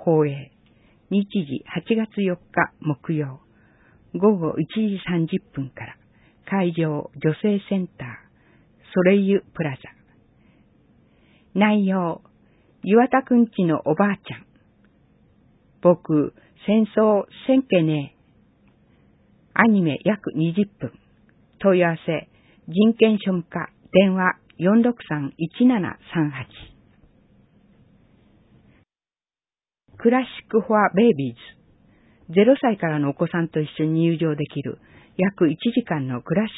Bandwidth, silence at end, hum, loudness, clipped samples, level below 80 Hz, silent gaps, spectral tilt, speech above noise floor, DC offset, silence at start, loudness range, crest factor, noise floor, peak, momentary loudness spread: 4 kHz; 0 s; none; -21 LUFS; under 0.1%; -60 dBFS; none; -12 dB/octave; over 70 dB; under 0.1%; 0 s; 5 LU; 22 dB; under -90 dBFS; 0 dBFS; 14 LU